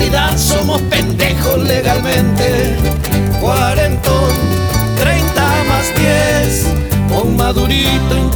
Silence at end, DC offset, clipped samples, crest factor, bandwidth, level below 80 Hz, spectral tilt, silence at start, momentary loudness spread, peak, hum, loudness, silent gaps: 0 s; under 0.1%; under 0.1%; 12 dB; over 20 kHz; -20 dBFS; -5 dB/octave; 0 s; 3 LU; 0 dBFS; none; -13 LUFS; none